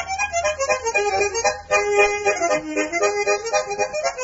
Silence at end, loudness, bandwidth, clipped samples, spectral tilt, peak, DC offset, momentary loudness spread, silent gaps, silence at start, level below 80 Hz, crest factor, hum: 0 s; -20 LUFS; 7.8 kHz; under 0.1%; -1.5 dB/octave; -4 dBFS; under 0.1%; 5 LU; none; 0 s; -48 dBFS; 16 dB; none